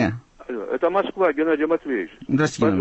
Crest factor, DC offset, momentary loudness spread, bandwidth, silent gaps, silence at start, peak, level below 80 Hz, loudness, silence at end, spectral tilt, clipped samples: 14 dB; under 0.1%; 11 LU; 8.4 kHz; none; 0 s; -8 dBFS; -54 dBFS; -22 LUFS; 0 s; -6.5 dB/octave; under 0.1%